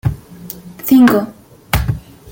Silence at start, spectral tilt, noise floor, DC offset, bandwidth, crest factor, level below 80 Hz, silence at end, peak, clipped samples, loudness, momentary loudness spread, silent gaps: 0.05 s; -6.5 dB/octave; -33 dBFS; under 0.1%; 17 kHz; 16 dB; -30 dBFS; 0 s; 0 dBFS; under 0.1%; -14 LUFS; 22 LU; none